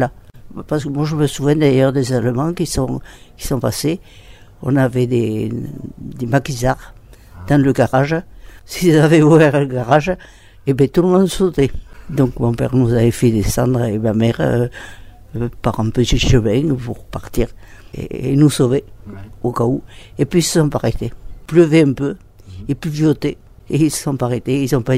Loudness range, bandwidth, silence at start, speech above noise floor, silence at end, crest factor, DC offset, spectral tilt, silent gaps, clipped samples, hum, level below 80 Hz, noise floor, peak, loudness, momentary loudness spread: 5 LU; 16 kHz; 0 s; 22 dB; 0 s; 16 dB; under 0.1%; -6.5 dB/octave; none; under 0.1%; none; -32 dBFS; -37 dBFS; 0 dBFS; -16 LUFS; 15 LU